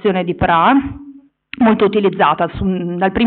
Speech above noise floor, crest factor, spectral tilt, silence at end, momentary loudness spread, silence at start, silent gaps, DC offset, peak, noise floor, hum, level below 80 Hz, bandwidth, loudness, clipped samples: 26 dB; 12 dB; -5 dB/octave; 0 s; 11 LU; 0.05 s; none; under 0.1%; -2 dBFS; -40 dBFS; none; -38 dBFS; 4.5 kHz; -15 LUFS; under 0.1%